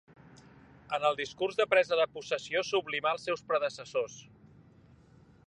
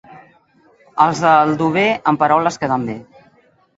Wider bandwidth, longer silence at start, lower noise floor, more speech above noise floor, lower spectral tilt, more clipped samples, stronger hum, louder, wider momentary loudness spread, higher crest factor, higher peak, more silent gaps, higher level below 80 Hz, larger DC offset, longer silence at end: first, 10 kHz vs 8 kHz; first, 0.9 s vs 0.1 s; first, -59 dBFS vs -54 dBFS; second, 28 dB vs 39 dB; second, -3 dB/octave vs -5.5 dB/octave; neither; neither; second, -31 LUFS vs -15 LUFS; second, 9 LU vs 13 LU; about the same, 20 dB vs 18 dB; second, -12 dBFS vs 0 dBFS; neither; second, -70 dBFS vs -58 dBFS; neither; first, 1.25 s vs 0.75 s